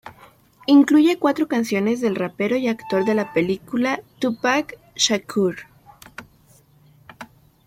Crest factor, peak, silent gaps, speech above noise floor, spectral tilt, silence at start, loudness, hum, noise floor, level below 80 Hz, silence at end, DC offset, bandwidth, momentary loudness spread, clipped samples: 18 dB; -4 dBFS; none; 35 dB; -4 dB/octave; 0.05 s; -20 LUFS; none; -54 dBFS; -62 dBFS; 0.4 s; under 0.1%; 16 kHz; 23 LU; under 0.1%